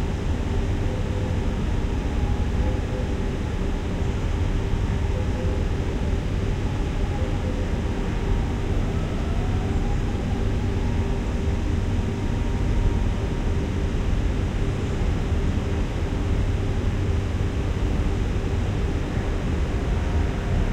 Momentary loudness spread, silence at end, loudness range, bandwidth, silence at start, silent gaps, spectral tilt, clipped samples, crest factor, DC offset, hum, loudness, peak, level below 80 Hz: 2 LU; 0 s; 1 LU; 10 kHz; 0 s; none; -7 dB/octave; under 0.1%; 14 dB; under 0.1%; none; -26 LUFS; -10 dBFS; -26 dBFS